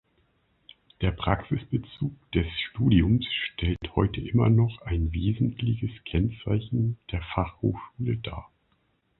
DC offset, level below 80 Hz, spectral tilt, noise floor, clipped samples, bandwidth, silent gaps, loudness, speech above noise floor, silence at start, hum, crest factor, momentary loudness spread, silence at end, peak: under 0.1%; -38 dBFS; -11 dB/octave; -70 dBFS; under 0.1%; 4.2 kHz; none; -27 LUFS; 44 dB; 1 s; none; 22 dB; 10 LU; 0.8 s; -6 dBFS